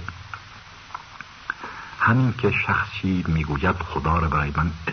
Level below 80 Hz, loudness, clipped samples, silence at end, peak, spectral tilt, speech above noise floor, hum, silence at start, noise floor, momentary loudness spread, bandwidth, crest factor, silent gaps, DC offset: -36 dBFS; -23 LUFS; under 0.1%; 0 s; -6 dBFS; -7.5 dB/octave; 21 dB; none; 0 s; -43 dBFS; 18 LU; 6.6 kHz; 18 dB; none; under 0.1%